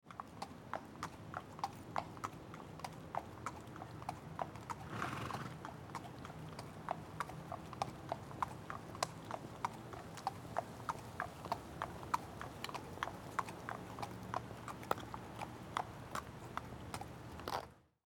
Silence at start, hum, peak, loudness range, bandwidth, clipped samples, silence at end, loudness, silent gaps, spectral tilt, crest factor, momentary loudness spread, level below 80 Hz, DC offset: 0.05 s; none; -16 dBFS; 3 LU; 19.5 kHz; under 0.1%; 0.25 s; -46 LUFS; none; -4.5 dB/octave; 30 dB; 7 LU; -64 dBFS; under 0.1%